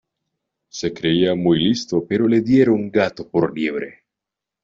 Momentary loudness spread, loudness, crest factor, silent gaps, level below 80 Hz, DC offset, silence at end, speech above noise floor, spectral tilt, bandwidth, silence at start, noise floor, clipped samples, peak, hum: 12 LU; -19 LUFS; 16 dB; none; -56 dBFS; under 0.1%; 0.7 s; 67 dB; -6 dB/octave; 7.6 kHz; 0.75 s; -85 dBFS; under 0.1%; -4 dBFS; none